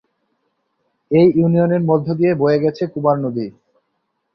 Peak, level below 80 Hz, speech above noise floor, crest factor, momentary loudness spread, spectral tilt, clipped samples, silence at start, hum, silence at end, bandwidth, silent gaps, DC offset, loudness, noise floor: -2 dBFS; -58 dBFS; 56 dB; 16 dB; 9 LU; -10.5 dB/octave; under 0.1%; 1.1 s; none; 0.85 s; 6 kHz; none; under 0.1%; -16 LUFS; -71 dBFS